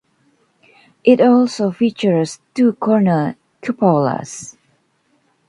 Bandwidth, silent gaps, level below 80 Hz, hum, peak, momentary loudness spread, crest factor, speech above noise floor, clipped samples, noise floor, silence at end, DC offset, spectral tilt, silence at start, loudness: 11 kHz; none; -62 dBFS; none; 0 dBFS; 14 LU; 16 dB; 47 dB; under 0.1%; -62 dBFS; 1 s; under 0.1%; -6.5 dB/octave; 1.05 s; -16 LUFS